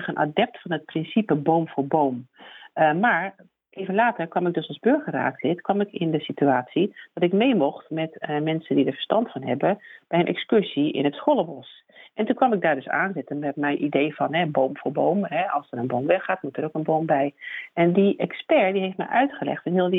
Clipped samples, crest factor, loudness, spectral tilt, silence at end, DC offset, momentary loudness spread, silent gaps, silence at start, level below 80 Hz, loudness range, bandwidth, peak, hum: under 0.1%; 18 dB; -24 LUFS; -9.5 dB/octave; 0 s; under 0.1%; 8 LU; none; 0 s; -72 dBFS; 1 LU; 4 kHz; -6 dBFS; none